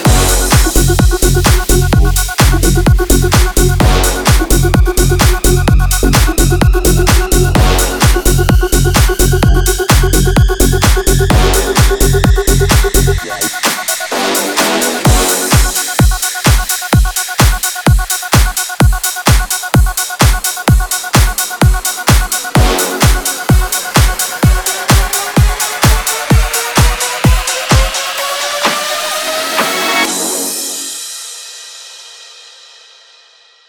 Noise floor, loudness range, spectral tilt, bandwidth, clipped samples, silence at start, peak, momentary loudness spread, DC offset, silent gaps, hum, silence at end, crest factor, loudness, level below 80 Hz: -45 dBFS; 3 LU; -4 dB/octave; over 20 kHz; 0.4%; 0 s; 0 dBFS; 5 LU; under 0.1%; none; none; 1.4 s; 10 dB; -11 LUFS; -14 dBFS